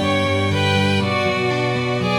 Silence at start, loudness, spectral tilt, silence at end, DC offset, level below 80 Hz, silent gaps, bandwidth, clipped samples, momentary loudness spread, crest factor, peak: 0 s; -18 LUFS; -5.5 dB/octave; 0 s; under 0.1%; -48 dBFS; none; 14 kHz; under 0.1%; 3 LU; 14 dB; -6 dBFS